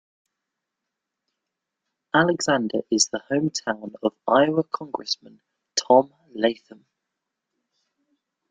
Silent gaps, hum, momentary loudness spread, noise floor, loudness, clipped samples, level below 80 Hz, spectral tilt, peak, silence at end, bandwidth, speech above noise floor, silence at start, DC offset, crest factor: none; none; 10 LU; -84 dBFS; -23 LUFS; under 0.1%; -68 dBFS; -3.5 dB/octave; -2 dBFS; 1.95 s; 9.6 kHz; 61 dB; 2.15 s; under 0.1%; 24 dB